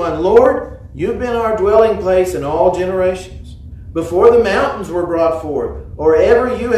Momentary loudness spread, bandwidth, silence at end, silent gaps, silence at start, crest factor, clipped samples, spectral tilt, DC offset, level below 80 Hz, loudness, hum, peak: 14 LU; 13.5 kHz; 0 s; none; 0 s; 14 dB; 0.1%; -6.5 dB/octave; under 0.1%; -34 dBFS; -14 LUFS; none; 0 dBFS